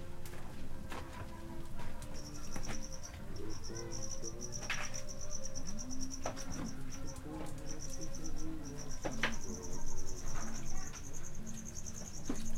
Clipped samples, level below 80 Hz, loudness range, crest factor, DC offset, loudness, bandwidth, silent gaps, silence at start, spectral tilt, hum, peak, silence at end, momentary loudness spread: under 0.1%; -42 dBFS; 3 LU; 18 dB; under 0.1%; -45 LUFS; 13 kHz; none; 0 s; -3.5 dB/octave; none; -20 dBFS; 0 s; 8 LU